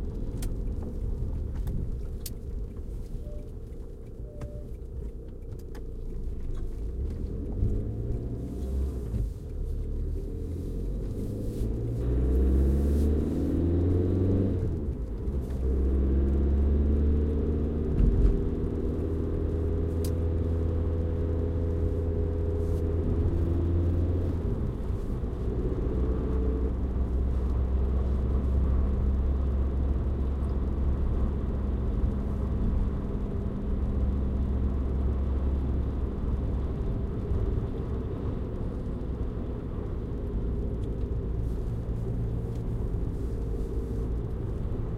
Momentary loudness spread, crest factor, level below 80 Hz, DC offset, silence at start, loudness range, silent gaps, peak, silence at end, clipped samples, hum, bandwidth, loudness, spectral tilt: 11 LU; 16 dB; -30 dBFS; under 0.1%; 0 s; 9 LU; none; -10 dBFS; 0 s; under 0.1%; none; 13 kHz; -30 LUFS; -9.5 dB/octave